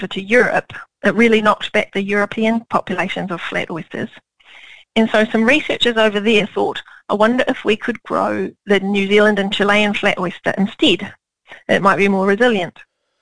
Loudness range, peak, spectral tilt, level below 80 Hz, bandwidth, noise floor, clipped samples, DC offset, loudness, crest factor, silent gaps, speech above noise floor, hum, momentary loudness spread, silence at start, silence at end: 4 LU; 0 dBFS; -5 dB/octave; -52 dBFS; 10.5 kHz; -43 dBFS; under 0.1%; 1%; -16 LUFS; 16 dB; none; 27 dB; none; 10 LU; 0 s; 0 s